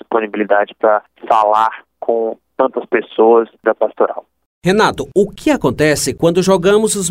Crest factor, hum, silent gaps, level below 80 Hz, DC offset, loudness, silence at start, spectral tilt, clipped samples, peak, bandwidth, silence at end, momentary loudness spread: 14 dB; none; 4.46-4.62 s; -46 dBFS; under 0.1%; -15 LUFS; 0.1 s; -4.5 dB/octave; under 0.1%; 0 dBFS; 16 kHz; 0 s; 7 LU